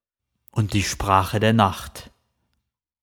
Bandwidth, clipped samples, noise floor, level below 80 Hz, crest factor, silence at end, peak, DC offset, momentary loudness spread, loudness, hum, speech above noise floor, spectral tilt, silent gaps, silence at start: 19 kHz; under 0.1%; -77 dBFS; -42 dBFS; 22 dB; 0.95 s; -2 dBFS; under 0.1%; 17 LU; -21 LUFS; none; 57 dB; -5 dB/octave; none; 0.55 s